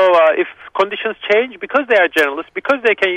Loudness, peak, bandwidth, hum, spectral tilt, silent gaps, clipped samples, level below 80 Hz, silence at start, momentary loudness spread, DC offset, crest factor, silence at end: -15 LUFS; -2 dBFS; 14 kHz; none; -3.5 dB/octave; none; under 0.1%; -60 dBFS; 0 s; 8 LU; under 0.1%; 14 dB; 0 s